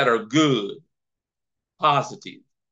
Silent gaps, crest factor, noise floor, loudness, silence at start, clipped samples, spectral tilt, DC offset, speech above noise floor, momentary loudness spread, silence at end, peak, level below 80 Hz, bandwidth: none; 18 dB; -85 dBFS; -21 LUFS; 0 s; under 0.1%; -5 dB/octave; under 0.1%; 64 dB; 18 LU; 0.4 s; -6 dBFS; -76 dBFS; 8 kHz